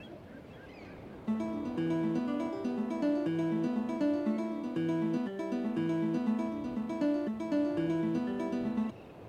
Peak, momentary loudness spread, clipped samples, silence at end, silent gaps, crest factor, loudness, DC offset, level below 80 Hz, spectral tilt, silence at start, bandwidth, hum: -20 dBFS; 12 LU; under 0.1%; 0 s; none; 12 dB; -33 LUFS; under 0.1%; -66 dBFS; -8 dB/octave; 0 s; 9.4 kHz; none